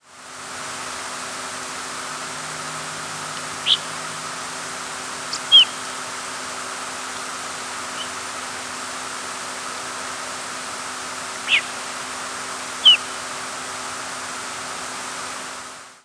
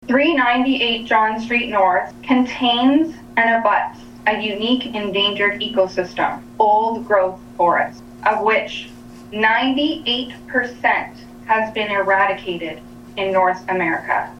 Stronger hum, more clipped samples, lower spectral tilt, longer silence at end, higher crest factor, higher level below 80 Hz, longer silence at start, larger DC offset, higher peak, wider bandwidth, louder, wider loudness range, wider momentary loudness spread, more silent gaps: neither; neither; second, 0.5 dB/octave vs -5 dB/octave; about the same, 0.05 s vs 0 s; first, 22 dB vs 16 dB; second, -64 dBFS vs -52 dBFS; about the same, 0.05 s vs 0 s; neither; about the same, -2 dBFS vs -2 dBFS; about the same, 11 kHz vs 11.5 kHz; second, -23 LUFS vs -18 LUFS; first, 9 LU vs 3 LU; first, 12 LU vs 9 LU; neither